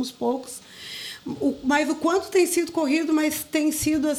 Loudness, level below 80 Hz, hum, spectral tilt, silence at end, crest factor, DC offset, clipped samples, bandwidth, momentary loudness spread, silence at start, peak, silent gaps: -24 LUFS; -56 dBFS; none; -3 dB/octave; 0 s; 14 dB; under 0.1%; under 0.1%; 19 kHz; 13 LU; 0 s; -10 dBFS; none